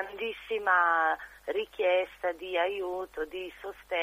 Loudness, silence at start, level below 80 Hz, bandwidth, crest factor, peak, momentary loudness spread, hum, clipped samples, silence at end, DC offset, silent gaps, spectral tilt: -30 LUFS; 0 s; -64 dBFS; 15.5 kHz; 18 dB; -12 dBFS; 12 LU; none; under 0.1%; 0 s; under 0.1%; none; -3.5 dB/octave